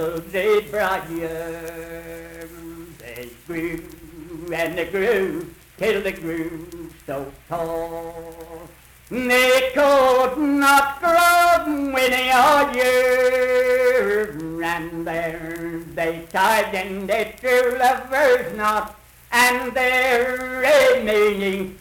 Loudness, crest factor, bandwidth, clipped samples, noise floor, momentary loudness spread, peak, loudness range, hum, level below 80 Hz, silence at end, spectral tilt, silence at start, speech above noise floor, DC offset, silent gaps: -19 LUFS; 14 dB; 19 kHz; under 0.1%; -45 dBFS; 20 LU; -6 dBFS; 12 LU; none; -48 dBFS; 0 s; -3.5 dB/octave; 0 s; 25 dB; under 0.1%; none